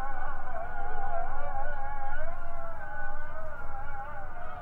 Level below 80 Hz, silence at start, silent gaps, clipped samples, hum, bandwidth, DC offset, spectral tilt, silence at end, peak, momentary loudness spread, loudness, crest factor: -32 dBFS; 0 s; none; under 0.1%; none; 2.4 kHz; under 0.1%; -7.5 dB/octave; 0 s; -16 dBFS; 6 LU; -39 LUFS; 10 dB